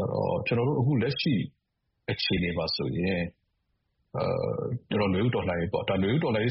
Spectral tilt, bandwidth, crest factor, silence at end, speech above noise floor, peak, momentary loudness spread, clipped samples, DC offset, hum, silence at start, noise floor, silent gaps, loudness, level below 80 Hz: -5 dB/octave; 5.8 kHz; 14 dB; 0 s; 51 dB; -14 dBFS; 7 LU; under 0.1%; under 0.1%; none; 0 s; -78 dBFS; none; -28 LUFS; -54 dBFS